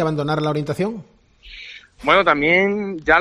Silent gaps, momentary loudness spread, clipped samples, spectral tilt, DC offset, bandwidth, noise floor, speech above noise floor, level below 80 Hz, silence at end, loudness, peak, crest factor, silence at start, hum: none; 21 LU; under 0.1%; -6.5 dB/octave; under 0.1%; 13 kHz; -42 dBFS; 24 dB; -46 dBFS; 0 s; -18 LUFS; 0 dBFS; 18 dB; 0 s; none